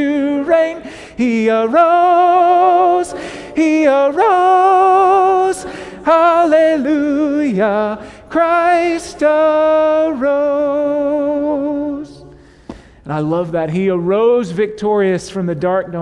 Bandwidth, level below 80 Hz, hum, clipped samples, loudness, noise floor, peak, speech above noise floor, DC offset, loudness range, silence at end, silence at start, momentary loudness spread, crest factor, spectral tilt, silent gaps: 11.5 kHz; -50 dBFS; none; under 0.1%; -14 LUFS; -40 dBFS; 0 dBFS; 27 dB; under 0.1%; 6 LU; 0 s; 0 s; 11 LU; 12 dB; -6.5 dB/octave; none